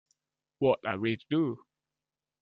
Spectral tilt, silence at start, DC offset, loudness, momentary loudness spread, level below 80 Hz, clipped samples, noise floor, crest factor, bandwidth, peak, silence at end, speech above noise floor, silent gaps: -9 dB/octave; 0.6 s; under 0.1%; -30 LUFS; 6 LU; -72 dBFS; under 0.1%; under -90 dBFS; 20 dB; 5 kHz; -14 dBFS; 0.85 s; over 61 dB; none